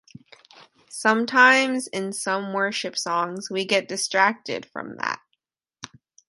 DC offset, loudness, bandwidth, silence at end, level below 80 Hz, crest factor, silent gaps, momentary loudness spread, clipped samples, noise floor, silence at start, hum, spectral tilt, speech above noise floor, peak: under 0.1%; -22 LUFS; 12 kHz; 0.45 s; -74 dBFS; 22 dB; none; 20 LU; under 0.1%; -76 dBFS; 0.9 s; none; -2.5 dB/octave; 53 dB; -2 dBFS